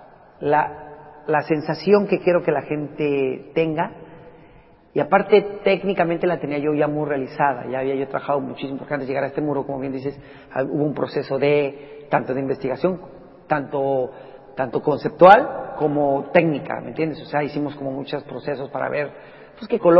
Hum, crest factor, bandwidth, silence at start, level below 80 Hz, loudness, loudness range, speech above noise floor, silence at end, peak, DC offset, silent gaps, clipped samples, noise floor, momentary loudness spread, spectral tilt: none; 22 dB; 5.8 kHz; 0 s; -58 dBFS; -21 LUFS; 7 LU; 29 dB; 0 s; 0 dBFS; under 0.1%; none; under 0.1%; -49 dBFS; 12 LU; -9 dB/octave